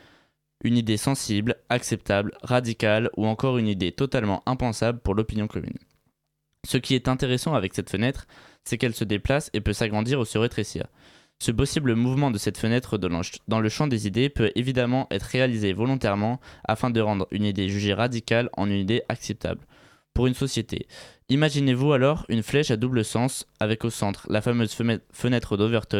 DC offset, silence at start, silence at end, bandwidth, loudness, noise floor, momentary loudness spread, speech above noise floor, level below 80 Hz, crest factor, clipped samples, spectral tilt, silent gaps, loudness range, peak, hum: under 0.1%; 0.65 s; 0 s; 15.5 kHz; -25 LUFS; -77 dBFS; 7 LU; 52 dB; -44 dBFS; 18 dB; under 0.1%; -5.5 dB/octave; none; 3 LU; -6 dBFS; none